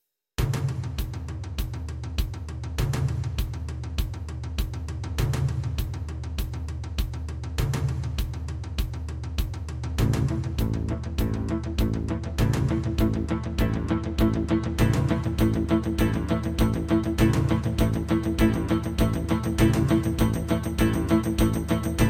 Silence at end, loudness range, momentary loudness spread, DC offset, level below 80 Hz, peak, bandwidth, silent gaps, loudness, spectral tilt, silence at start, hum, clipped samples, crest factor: 0 s; 7 LU; 10 LU; under 0.1%; -32 dBFS; -8 dBFS; 16.5 kHz; none; -27 LUFS; -6.5 dB/octave; 0.4 s; none; under 0.1%; 16 dB